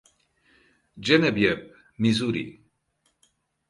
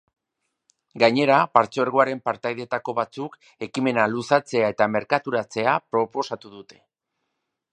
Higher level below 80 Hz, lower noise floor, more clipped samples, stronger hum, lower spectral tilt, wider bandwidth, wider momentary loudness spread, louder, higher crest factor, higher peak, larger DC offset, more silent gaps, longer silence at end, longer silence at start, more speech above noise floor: first, -58 dBFS vs -68 dBFS; second, -72 dBFS vs -79 dBFS; neither; neither; about the same, -5.5 dB/octave vs -5.5 dB/octave; first, 11.5 kHz vs 9.8 kHz; about the same, 13 LU vs 12 LU; about the same, -24 LUFS vs -22 LUFS; about the same, 22 dB vs 24 dB; second, -6 dBFS vs 0 dBFS; neither; neither; about the same, 1.15 s vs 1.1 s; about the same, 0.95 s vs 0.95 s; second, 49 dB vs 57 dB